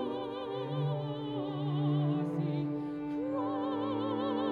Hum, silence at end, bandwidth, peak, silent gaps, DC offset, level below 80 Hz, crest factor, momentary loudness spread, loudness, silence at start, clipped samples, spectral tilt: none; 0 s; 4.7 kHz; -22 dBFS; none; under 0.1%; -70 dBFS; 12 dB; 6 LU; -34 LUFS; 0 s; under 0.1%; -9.5 dB/octave